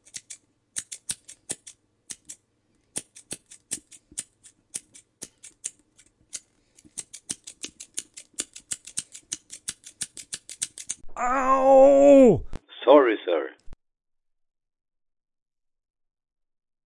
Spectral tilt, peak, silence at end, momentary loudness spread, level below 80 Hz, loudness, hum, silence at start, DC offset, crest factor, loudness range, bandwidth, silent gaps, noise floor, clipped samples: -4 dB/octave; -4 dBFS; 3.15 s; 24 LU; -52 dBFS; -22 LUFS; none; 0.15 s; under 0.1%; 22 dB; 19 LU; 11.5 kHz; none; -69 dBFS; under 0.1%